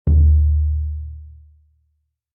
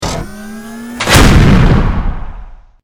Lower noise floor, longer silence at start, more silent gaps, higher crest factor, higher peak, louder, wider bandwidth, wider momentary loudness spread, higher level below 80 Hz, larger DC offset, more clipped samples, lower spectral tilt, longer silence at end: first, -69 dBFS vs -30 dBFS; about the same, 0.05 s vs 0 s; neither; about the same, 12 dB vs 10 dB; second, -6 dBFS vs 0 dBFS; second, -18 LUFS vs -9 LUFS; second, 0.8 kHz vs over 20 kHz; about the same, 20 LU vs 21 LU; second, -20 dBFS vs -14 dBFS; neither; second, under 0.1% vs 2%; first, -15.5 dB/octave vs -5 dB/octave; first, 1.05 s vs 0.3 s